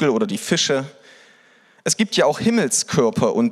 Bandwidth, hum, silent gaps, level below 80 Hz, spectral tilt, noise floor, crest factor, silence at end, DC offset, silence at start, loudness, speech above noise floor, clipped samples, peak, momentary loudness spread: 14 kHz; none; none; -62 dBFS; -3.5 dB/octave; -54 dBFS; 16 dB; 0 s; under 0.1%; 0 s; -19 LUFS; 35 dB; under 0.1%; -4 dBFS; 6 LU